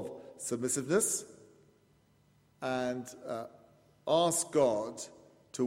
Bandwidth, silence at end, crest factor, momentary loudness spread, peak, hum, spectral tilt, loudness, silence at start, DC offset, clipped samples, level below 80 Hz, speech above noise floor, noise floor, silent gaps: 16 kHz; 0 s; 20 dB; 17 LU; -14 dBFS; none; -3.5 dB/octave; -32 LUFS; 0 s; under 0.1%; under 0.1%; -74 dBFS; 35 dB; -67 dBFS; none